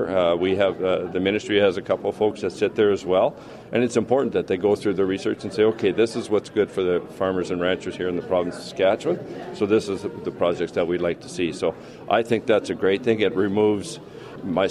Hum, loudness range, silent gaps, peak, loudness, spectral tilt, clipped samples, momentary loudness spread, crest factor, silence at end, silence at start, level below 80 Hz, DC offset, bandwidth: none; 2 LU; none; -6 dBFS; -23 LUFS; -5.5 dB/octave; under 0.1%; 7 LU; 18 dB; 0 s; 0 s; -58 dBFS; under 0.1%; 11.5 kHz